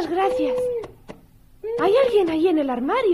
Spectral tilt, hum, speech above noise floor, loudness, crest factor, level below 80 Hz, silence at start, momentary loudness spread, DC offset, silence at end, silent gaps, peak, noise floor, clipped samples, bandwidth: -6 dB/octave; none; 30 dB; -21 LUFS; 12 dB; -52 dBFS; 0 s; 13 LU; under 0.1%; 0 s; none; -8 dBFS; -50 dBFS; under 0.1%; 13 kHz